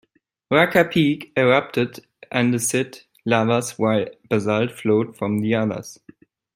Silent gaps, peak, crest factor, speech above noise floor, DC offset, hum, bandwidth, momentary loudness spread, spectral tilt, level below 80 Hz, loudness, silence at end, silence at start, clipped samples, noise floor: none; -2 dBFS; 20 dB; 31 dB; under 0.1%; none; 16.5 kHz; 9 LU; -5 dB/octave; -60 dBFS; -20 LUFS; 0.6 s; 0.5 s; under 0.1%; -51 dBFS